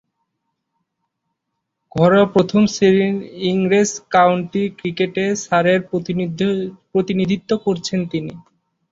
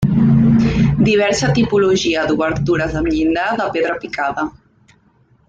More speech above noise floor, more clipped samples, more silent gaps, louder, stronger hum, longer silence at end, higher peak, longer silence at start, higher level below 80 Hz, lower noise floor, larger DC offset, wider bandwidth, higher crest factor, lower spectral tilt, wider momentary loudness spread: first, 60 dB vs 38 dB; neither; neither; about the same, -18 LUFS vs -16 LUFS; neither; second, 0.5 s vs 1 s; about the same, -2 dBFS vs -2 dBFS; first, 1.95 s vs 0 s; second, -56 dBFS vs -36 dBFS; first, -77 dBFS vs -54 dBFS; neither; second, 7.8 kHz vs 9 kHz; about the same, 16 dB vs 12 dB; about the same, -5.5 dB/octave vs -6 dB/octave; about the same, 9 LU vs 8 LU